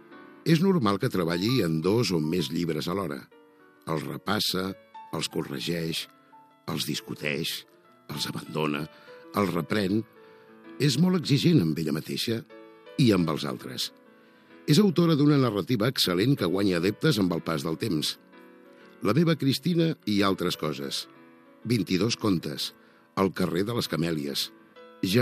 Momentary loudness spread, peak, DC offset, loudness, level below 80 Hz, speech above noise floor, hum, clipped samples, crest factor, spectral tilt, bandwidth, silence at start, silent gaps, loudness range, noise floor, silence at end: 11 LU; -8 dBFS; under 0.1%; -27 LUFS; -64 dBFS; 30 dB; none; under 0.1%; 18 dB; -5.5 dB/octave; 15 kHz; 0.1 s; none; 7 LU; -56 dBFS; 0 s